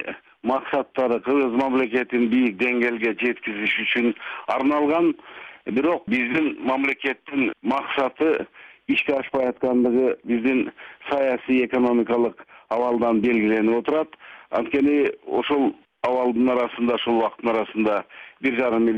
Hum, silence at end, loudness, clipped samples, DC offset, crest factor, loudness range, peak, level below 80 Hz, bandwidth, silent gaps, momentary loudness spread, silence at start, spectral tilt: none; 0 s; -22 LUFS; under 0.1%; under 0.1%; 12 dB; 2 LU; -10 dBFS; -60 dBFS; 6.2 kHz; none; 7 LU; 0 s; -7 dB/octave